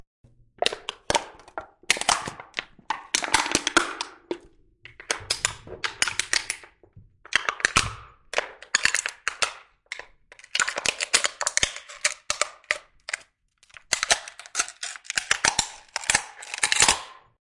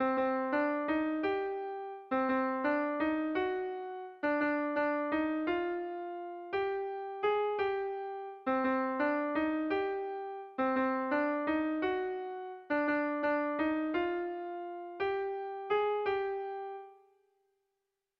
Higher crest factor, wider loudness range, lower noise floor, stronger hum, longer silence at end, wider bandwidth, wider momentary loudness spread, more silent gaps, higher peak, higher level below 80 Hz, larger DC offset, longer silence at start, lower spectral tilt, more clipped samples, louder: first, 28 dB vs 14 dB; about the same, 3 LU vs 2 LU; second, -62 dBFS vs -86 dBFS; neither; second, 0.35 s vs 1.25 s; first, 11.5 kHz vs 5.6 kHz; first, 14 LU vs 9 LU; neither; first, 0 dBFS vs -20 dBFS; first, -52 dBFS vs -70 dBFS; neither; first, 0.6 s vs 0 s; second, 0 dB/octave vs -2.5 dB/octave; neither; first, -25 LUFS vs -34 LUFS